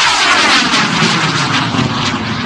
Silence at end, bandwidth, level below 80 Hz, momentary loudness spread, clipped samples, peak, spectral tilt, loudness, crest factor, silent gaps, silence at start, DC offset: 0 s; 11 kHz; -42 dBFS; 6 LU; under 0.1%; 0 dBFS; -3 dB/octave; -11 LUFS; 12 dB; none; 0 s; under 0.1%